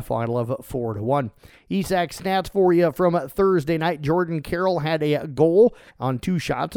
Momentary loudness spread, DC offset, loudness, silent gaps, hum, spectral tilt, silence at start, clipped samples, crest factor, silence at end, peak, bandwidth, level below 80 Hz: 9 LU; under 0.1%; -22 LUFS; none; none; -7 dB/octave; 0 s; under 0.1%; 16 dB; 0 s; -6 dBFS; 18.5 kHz; -48 dBFS